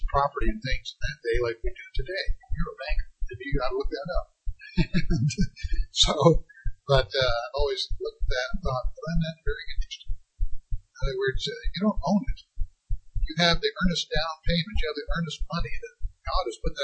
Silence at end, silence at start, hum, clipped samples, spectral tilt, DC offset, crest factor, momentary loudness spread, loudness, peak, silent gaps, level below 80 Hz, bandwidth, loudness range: 0 s; 0 s; none; under 0.1%; -5 dB/octave; under 0.1%; 20 dB; 16 LU; -28 LUFS; -6 dBFS; none; -30 dBFS; 8.6 kHz; 7 LU